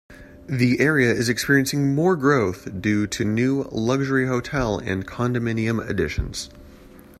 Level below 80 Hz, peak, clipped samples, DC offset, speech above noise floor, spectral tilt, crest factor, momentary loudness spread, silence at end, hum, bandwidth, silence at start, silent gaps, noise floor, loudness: -42 dBFS; -4 dBFS; under 0.1%; under 0.1%; 24 dB; -5.5 dB/octave; 18 dB; 8 LU; 0.25 s; none; 14.5 kHz; 0.1 s; none; -46 dBFS; -22 LUFS